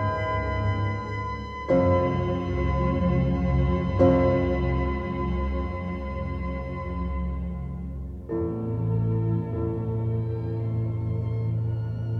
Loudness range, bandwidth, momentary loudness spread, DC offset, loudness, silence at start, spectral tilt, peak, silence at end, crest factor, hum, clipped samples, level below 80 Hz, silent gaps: 7 LU; 6.4 kHz; 10 LU; under 0.1%; -27 LUFS; 0 s; -9.5 dB/octave; -8 dBFS; 0 s; 18 dB; none; under 0.1%; -34 dBFS; none